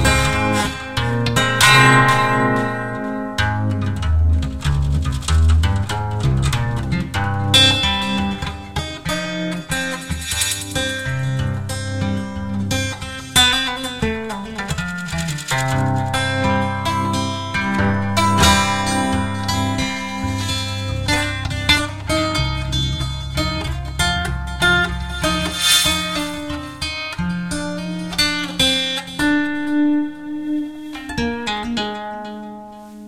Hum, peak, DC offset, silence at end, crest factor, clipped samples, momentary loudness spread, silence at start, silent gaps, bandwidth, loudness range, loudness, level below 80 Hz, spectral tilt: none; 0 dBFS; 0.8%; 0 s; 18 dB; under 0.1%; 12 LU; 0 s; none; 16.5 kHz; 6 LU; -18 LUFS; -30 dBFS; -4 dB/octave